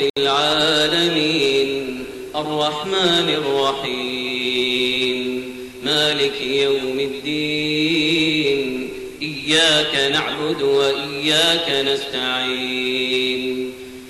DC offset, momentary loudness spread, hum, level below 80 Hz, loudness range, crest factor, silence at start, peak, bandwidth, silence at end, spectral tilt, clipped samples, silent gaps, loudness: under 0.1%; 10 LU; none; -54 dBFS; 2 LU; 14 dB; 0 s; -6 dBFS; 13.5 kHz; 0 s; -3 dB/octave; under 0.1%; 0.10-0.14 s; -18 LUFS